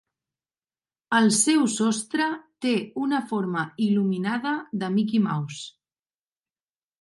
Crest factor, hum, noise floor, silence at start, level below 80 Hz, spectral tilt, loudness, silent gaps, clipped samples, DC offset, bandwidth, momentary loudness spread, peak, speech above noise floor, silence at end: 18 dB; none; under -90 dBFS; 1.1 s; -76 dBFS; -4 dB/octave; -24 LUFS; none; under 0.1%; under 0.1%; 11.5 kHz; 9 LU; -8 dBFS; over 66 dB; 1.35 s